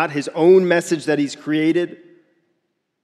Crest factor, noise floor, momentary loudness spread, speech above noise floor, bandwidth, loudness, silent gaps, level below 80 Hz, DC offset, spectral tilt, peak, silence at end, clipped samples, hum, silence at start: 16 dB; -72 dBFS; 9 LU; 55 dB; 12.5 kHz; -18 LUFS; none; -76 dBFS; under 0.1%; -5.5 dB/octave; -2 dBFS; 1.1 s; under 0.1%; none; 0 s